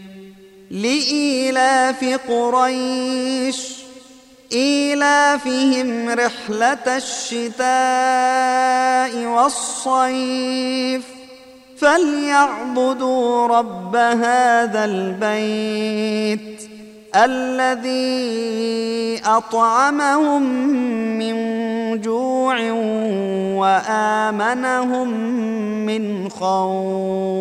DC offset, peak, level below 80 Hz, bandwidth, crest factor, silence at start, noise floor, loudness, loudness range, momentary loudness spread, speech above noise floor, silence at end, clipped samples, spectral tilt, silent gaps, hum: under 0.1%; 0 dBFS; -64 dBFS; 13 kHz; 18 dB; 0 s; -45 dBFS; -18 LUFS; 3 LU; 7 LU; 27 dB; 0 s; under 0.1%; -3.5 dB/octave; none; none